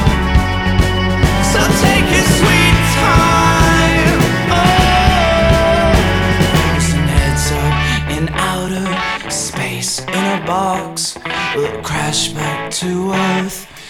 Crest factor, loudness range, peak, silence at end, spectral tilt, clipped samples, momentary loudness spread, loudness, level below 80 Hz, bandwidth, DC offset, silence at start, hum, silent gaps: 12 dB; 7 LU; 0 dBFS; 0 s; -4.5 dB/octave; under 0.1%; 8 LU; -13 LUFS; -22 dBFS; 18.5 kHz; under 0.1%; 0 s; none; none